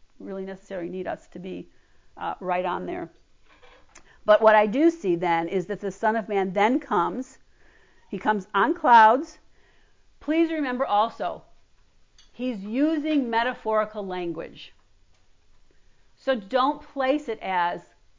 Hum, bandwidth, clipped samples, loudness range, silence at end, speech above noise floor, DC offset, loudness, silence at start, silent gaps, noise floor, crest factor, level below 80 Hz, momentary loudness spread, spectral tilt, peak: none; 7.6 kHz; under 0.1%; 9 LU; 0.4 s; 34 dB; under 0.1%; -24 LUFS; 0.2 s; none; -57 dBFS; 18 dB; -60 dBFS; 18 LU; -6 dB/octave; -6 dBFS